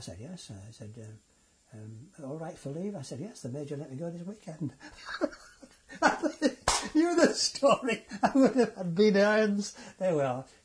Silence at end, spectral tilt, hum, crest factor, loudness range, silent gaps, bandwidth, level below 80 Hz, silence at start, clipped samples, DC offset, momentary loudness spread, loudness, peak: 0.2 s; -4.5 dB/octave; none; 22 dB; 15 LU; none; 11 kHz; -58 dBFS; 0 s; under 0.1%; under 0.1%; 22 LU; -29 LUFS; -10 dBFS